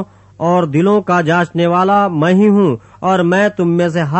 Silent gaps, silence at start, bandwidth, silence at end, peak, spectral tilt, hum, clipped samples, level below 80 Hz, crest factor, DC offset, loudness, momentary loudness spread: none; 0 s; 8.4 kHz; 0 s; -2 dBFS; -7.5 dB/octave; none; under 0.1%; -54 dBFS; 12 dB; under 0.1%; -13 LUFS; 5 LU